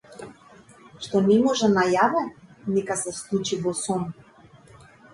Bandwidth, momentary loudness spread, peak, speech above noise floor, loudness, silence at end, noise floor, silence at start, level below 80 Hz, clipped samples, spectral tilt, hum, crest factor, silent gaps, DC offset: 11.5 kHz; 18 LU; -8 dBFS; 29 dB; -23 LUFS; 1 s; -51 dBFS; 0.1 s; -60 dBFS; under 0.1%; -4.5 dB/octave; none; 18 dB; none; under 0.1%